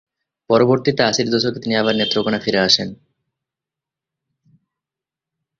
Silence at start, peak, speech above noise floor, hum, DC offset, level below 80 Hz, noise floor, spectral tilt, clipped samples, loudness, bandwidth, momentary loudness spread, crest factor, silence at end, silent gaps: 0.5 s; -2 dBFS; 70 dB; none; under 0.1%; -56 dBFS; -87 dBFS; -4 dB/octave; under 0.1%; -17 LUFS; 7.8 kHz; 5 LU; 20 dB; 2.65 s; none